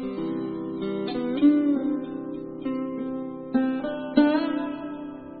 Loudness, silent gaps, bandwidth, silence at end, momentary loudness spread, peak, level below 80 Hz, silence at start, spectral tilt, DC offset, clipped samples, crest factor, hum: -26 LUFS; none; 4.8 kHz; 0 s; 13 LU; -6 dBFS; -60 dBFS; 0 s; -10.5 dB/octave; under 0.1%; under 0.1%; 20 dB; none